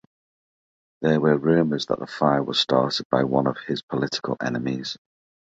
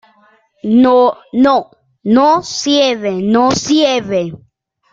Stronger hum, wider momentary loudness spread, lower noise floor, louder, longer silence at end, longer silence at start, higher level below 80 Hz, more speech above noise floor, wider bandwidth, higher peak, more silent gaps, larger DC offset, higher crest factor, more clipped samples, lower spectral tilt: neither; about the same, 8 LU vs 9 LU; first, under -90 dBFS vs -52 dBFS; second, -23 LUFS vs -12 LUFS; about the same, 0.55 s vs 0.55 s; first, 1 s vs 0.65 s; second, -60 dBFS vs -52 dBFS; first, over 68 dB vs 40 dB; about the same, 8 kHz vs 7.8 kHz; second, -4 dBFS vs 0 dBFS; first, 3.05-3.10 s, 3.83-3.88 s vs none; neither; first, 20 dB vs 12 dB; neither; first, -6 dB/octave vs -4.5 dB/octave